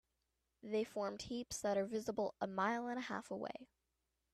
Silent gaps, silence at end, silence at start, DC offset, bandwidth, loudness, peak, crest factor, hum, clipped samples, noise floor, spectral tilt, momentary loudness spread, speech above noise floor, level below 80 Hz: none; 0.7 s; 0.65 s; under 0.1%; 14 kHz; -42 LUFS; -26 dBFS; 18 dB; none; under 0.1%; -87 dBFS; -4.5 dB/octave; 8 LU; 46 dB; -74 dBFS